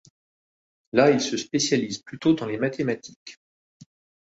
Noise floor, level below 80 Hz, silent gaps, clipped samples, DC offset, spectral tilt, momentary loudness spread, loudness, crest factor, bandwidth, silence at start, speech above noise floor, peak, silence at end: under -90 dBFS; -64 dBFS; 3.16-3.26 s; under 0.1%; under 0.1%; -4.5 dB/octave; 17 LU; -24 LUFS; 22 dB; 8 kHz; 0.95 s; over 66 dB; -4 dBFS; 0.9 s